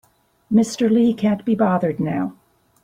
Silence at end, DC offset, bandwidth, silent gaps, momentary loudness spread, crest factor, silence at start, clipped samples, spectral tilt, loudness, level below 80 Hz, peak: 0.5 s; under 0.1%; 11 kHz; none; 7 LU; 16 dB; 0.5 s; under 0.1%; -7 dB/octave; -19 LUFS; -58 dBFS; -4 dBFS